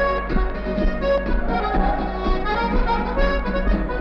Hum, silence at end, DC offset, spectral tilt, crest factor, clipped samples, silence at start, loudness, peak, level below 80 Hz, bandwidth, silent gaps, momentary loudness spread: none; 0 s; under 0.1%; -8 dB/octave; 14 dB; under 0.1%; 0 s; -22 LUFS; -6 dBFS; -24 dBFS; 6 kHz; none; 3 LU